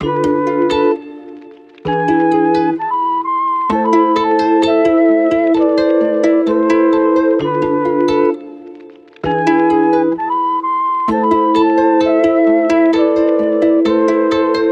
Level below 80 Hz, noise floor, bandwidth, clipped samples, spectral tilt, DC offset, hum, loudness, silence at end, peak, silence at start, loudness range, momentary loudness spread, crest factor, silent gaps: -48 dBFS; -37 dBFS; 7.8 kHz; under 0.1%; -6.5 dB/octave; under 0.1%; none; -13 LUFS; 0 s; 0 dBFS; 0 s; 3 LU; 5 LU; 14 dB; none